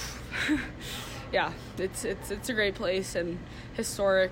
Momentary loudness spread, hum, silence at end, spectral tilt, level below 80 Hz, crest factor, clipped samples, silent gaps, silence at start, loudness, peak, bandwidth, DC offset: 9 LU; none; 0 s; -4 dB/octave; -48 dBFS; 16 dB; under 0.1%; none; 0 s; -31 LUFS; -14 dBFS; 16 kHz; under 0.1%